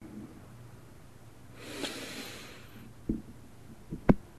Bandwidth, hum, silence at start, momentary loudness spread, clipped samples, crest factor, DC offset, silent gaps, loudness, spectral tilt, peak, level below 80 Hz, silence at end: 14 kHz; none; 0 s; 21 LU; under 0.1%; 34 dB; 0.2%; none; -37 LUFS; -6 dB/octave; -4 dBFS; -48 dBFS; 0 s